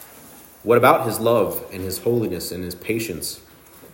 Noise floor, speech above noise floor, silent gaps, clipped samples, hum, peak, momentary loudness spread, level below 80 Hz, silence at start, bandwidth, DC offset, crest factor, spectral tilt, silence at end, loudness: -45 dBFS; 24 dB; none; under 0.1%; none; -2 dBFS; 15 LU; -56 dBFS; 0 s; 16.5 kHz; under 0.1%; 20 dB; -5 dB/octave; 0.05 s; -21 LUFS